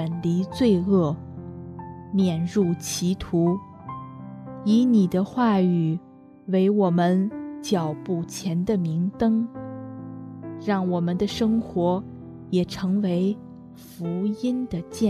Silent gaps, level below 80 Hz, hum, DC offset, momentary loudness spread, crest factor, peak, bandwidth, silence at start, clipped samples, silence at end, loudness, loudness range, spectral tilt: none; -54 dBFS; none; under 0.1%; 18 LU; 16 dB; -8 dBFS; 13.5 kHz; 0 s; under 0.1%; 0 s; -24 LUFS; 4 LU; -7 dB/octave